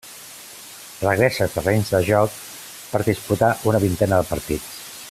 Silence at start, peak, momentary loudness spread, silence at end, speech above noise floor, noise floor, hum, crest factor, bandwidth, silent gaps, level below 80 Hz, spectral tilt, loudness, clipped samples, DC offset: 0.05 s; -2 dBFS; 18 LU; 0 s; 20 dB; -40 dBFS; none; 18 dB; 16 kHz; none; -46 dBFS; -5.5 dB/octave; -20 LUFS; under 0.1%; under 0.1%